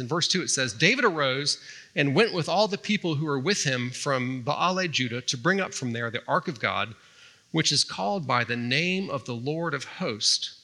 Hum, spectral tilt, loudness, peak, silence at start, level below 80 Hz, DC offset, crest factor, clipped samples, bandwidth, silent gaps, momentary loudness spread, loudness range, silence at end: none; -3.5 dB/octave; -25 LUFS; -6 dBFS; 0 s; -78 dBFS; under 0.1%; 22 dB; under 0.1%; 12.5 kHz; none; 8 LU; 3 LU; 0.05 s